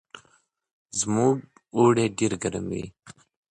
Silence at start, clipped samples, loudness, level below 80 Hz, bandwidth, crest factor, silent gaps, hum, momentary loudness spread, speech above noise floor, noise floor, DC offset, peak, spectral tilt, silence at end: 0.15 s; under 0.1%; -25 LUFS; -56 dBFS; 11 kHz; 18 dB; 0.73-0.85 s; none; 12 LU; 41 dB; -65 dBFS; under 0.1%; -8 dBFS; -5 dB/octave; 0.4 s